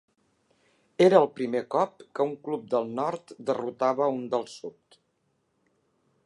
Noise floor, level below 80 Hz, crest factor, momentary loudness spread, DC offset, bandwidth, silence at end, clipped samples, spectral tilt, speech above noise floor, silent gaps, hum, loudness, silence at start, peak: -74 dBFS; -80 dBFS; 24 dB; 15 LU; under 0.1%; 11 kHz; 1.55 s; under 0.1%; -6.5 dB/octave; 47 dB; none; none; -27 LUFS; 1 s; -4 dBFS